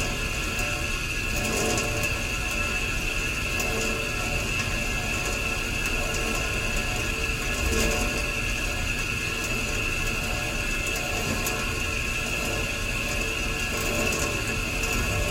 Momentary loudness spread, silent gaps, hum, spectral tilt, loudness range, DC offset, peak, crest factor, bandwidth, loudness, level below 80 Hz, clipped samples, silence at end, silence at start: 2 LU; none; none; -3 dB/octave; 1 LU; under 0.1%; -10 dBFS; 16 dB; 16.5 kHz; -26 LUFS; -34 dBFS; under 0.1%; 0 s; 0 s